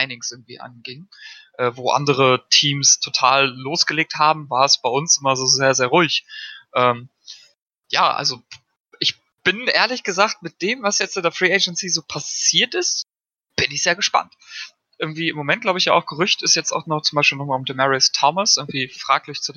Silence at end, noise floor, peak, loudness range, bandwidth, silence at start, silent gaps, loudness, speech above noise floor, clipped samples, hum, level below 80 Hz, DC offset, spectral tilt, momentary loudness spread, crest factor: 0.05 s; -78 dBFS; -2 dBFS; 5 LU; 12 kHz; 0 s; 7.62-7.66 s, 8.80-8.85 s; -18 LUFS; 59 dB; under 0.1%; none; -66 dBFS; under 0.1%; -2 dB/octave; 14 LU; 20 dB